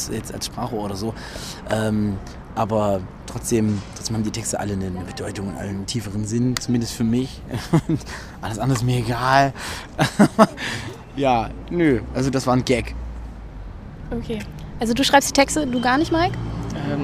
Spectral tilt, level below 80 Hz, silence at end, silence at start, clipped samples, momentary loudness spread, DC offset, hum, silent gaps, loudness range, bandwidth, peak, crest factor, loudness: -5 dB/octave; -38 dBFS; 0 s; 0 s; under 0.1%; 15 LU; under 0.1%; none; none; 5 LU; 15.5 kHz; 0 dBFS; 22 dB; -22 LUFS